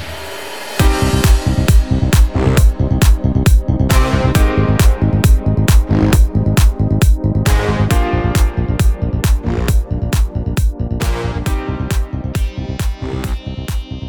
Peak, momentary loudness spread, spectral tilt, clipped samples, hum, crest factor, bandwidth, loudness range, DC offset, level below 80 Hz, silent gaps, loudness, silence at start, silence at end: 0 dBFS; 9 LU; -6 dB/octave; under 0.1%; none; 12 dB; 19.5 kHz; 6 LU; 1%; -16 dBFS; none; -15 LUFS; 0 s; 0 s